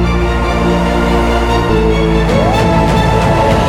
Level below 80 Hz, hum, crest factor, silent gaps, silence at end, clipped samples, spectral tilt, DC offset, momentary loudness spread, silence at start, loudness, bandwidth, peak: -18 dBFS; none; 10 dB; none; 0 s; under 0.1%; -6.5 dB/octave; under 0.1%; 2 LU; 0 s; -12 LUFS; 14 kHz; -2 dBFS